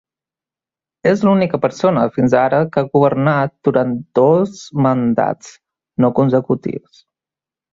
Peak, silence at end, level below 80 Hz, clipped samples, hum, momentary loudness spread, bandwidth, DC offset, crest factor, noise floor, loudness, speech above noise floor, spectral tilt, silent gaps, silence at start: 0 dBFS; 0.95 s; -56 dBFS; under 0.1%; none; 7 LU; 7.8 kHz; under 0.1%; 16 dB; -90 dBFS; -16 LUFS; 75 dB; -8 dB/octave; none; 1.05 s